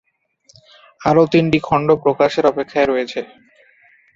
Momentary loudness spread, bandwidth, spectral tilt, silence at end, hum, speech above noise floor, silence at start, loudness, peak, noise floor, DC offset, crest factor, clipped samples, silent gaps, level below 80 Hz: 11 LU; 7.6 kHz; -7 dB/octave; 0.9 s; none; 41 dB; 1 s; -16 LUFS; -2 dBFS; -56 dBFS; under 0.1%; 16 dB; under 0.1%; none; -50 dBFS